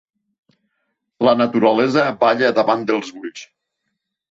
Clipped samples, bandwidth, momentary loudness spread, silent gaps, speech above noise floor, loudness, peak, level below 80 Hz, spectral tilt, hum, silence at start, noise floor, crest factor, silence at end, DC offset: under 0.1%; 7.8 kHz; 17 LU; none; 60 dB; -16 LUFS; -2 dBFS; -62 dBFS; -5.5 dB/octave; none; 1.2 s; -76 dBFS; 18 dB; 0.85 s; under 0.1%